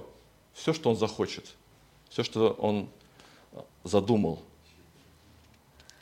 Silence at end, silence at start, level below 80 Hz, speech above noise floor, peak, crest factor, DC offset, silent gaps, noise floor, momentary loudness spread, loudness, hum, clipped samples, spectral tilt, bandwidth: 1.6 s; 0 s; -64 dBFS; 30 dB; -8 dBFS; 24 dB; under 0.1%; none; -59 dBFS; 23 LU; -29 LUFS; none; under 0.1%; -6 dB/octave; 16 kHz